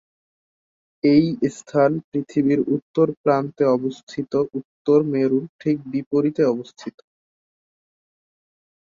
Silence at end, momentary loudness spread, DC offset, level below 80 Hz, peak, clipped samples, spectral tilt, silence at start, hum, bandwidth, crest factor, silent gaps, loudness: 2 s; 10 LU; under 0.1%; -62 dBFS; -4 dBFS; under 0.1%; -8 dB/octave; 1.05 s; none; 7.8 kHz; 18 dB; 2.04-2.12 s, 2.82-2.94 s, 3.17-3.24 s, 4.03-4.07 s, 4.65-4.85 s, 5.49-5.59 s, 6.06-6.11 s; -21 LUFS